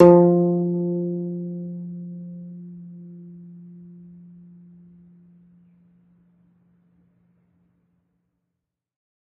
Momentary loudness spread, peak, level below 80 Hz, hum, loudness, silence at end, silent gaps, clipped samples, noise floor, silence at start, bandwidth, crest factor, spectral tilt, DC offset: 27 LU; 0 dBFS; -64 dBFS; none; -22 LUFS; 5.65 s; none; under 0.1%; -82 dBFS; 0 s; 2.9 kHz; 24 dB; -11.5 dB/octave; under 0.1%